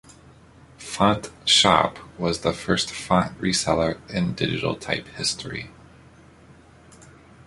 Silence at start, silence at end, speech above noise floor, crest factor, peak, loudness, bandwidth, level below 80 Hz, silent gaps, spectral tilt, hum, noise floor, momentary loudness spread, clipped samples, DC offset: 0.8 s; 1.75 s; 27 dB; 22 dB; -2 dBFS; -22 LUFS; 11.5 kHz; -48 dBFS; none; -3.5 dB/octave; none; -50 dBFS; 13 LU; under 0.1%; under 0.1%